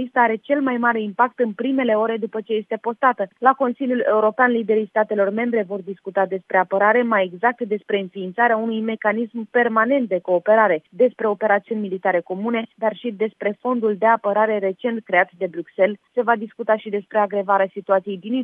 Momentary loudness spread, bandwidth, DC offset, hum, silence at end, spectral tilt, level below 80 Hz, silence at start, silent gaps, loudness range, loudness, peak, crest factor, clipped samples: 8 LU; 4.7 kHz; under 0.1%; none; 0 s; -9 dB/octave; -80 dBFS; 0 s; none; 2 LU; -20 LUFS; 0 dBFS; 20 dB; under 0.1%